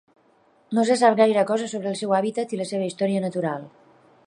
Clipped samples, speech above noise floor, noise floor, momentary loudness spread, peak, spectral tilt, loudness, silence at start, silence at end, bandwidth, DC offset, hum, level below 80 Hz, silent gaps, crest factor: under 0.1%; 38 dB; -60 dBFS; 10 LU; -6 dBFS; -5.5 dB/octave; -23 LUFS; 0.7 s; 0.6 s; 11 kHz; under 0.1%; none; -76 dBFS; none; 18 dB